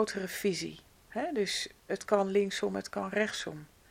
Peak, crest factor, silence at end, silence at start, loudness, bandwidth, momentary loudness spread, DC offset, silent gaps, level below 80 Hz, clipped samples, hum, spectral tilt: -12 dBFS; 22 dB; 0.25 s; 0 s; -33 LUFS; 16.5 kHz; 11 LU; under 0.1%; none; -66 dBFS; under 0.1%; none; -4 dB/octave